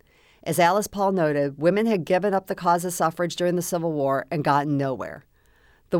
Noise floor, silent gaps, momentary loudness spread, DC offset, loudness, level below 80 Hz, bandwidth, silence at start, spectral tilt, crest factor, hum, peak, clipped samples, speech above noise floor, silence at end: -58 dBFS; none; 7 LU; under 0.1%; -23 LUFS; -60 dBFS; over 20 kHz; 0.45 s; -5.5 dB/octave; 16 dB; none; -8 dBFS; under 0.1%; 35 dB; 0 s